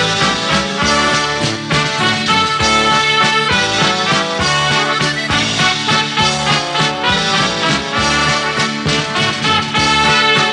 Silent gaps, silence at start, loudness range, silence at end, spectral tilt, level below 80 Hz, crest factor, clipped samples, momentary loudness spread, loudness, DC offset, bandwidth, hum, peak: none; 0 s; 1 LU; 0 s; -3 dB/octave; -38 dBFS; 14 dB; under 0.1%; 4 LU; -13 LUFS; under 0.1%; 11 kHz; none; 0 dBFS